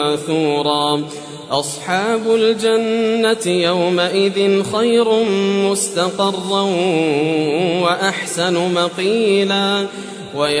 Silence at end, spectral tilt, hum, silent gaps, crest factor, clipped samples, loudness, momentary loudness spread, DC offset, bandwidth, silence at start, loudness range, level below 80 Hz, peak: 0 s; -4 dB/octave; none; none; 14 dB; under 0.1%; -16 LUFS; 6 LU; under 0.1%; 11 kHz; 0 s; 2 LU; -62 dBFS; -2 dBFS